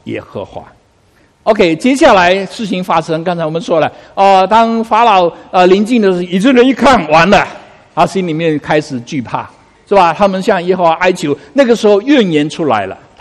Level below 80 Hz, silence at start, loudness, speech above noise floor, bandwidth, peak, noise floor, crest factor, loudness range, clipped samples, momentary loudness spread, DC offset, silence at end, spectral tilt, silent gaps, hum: -42 dBFS; 0.05 s; -10 LUFS; 39 dB; 12.5 kHz; 0 dBFS; -50 dBFS; 10 dB; 4 LU; 0.5%; 13 LU; under 0.1%; 0.25 s; -5.5 dB/octave; none; none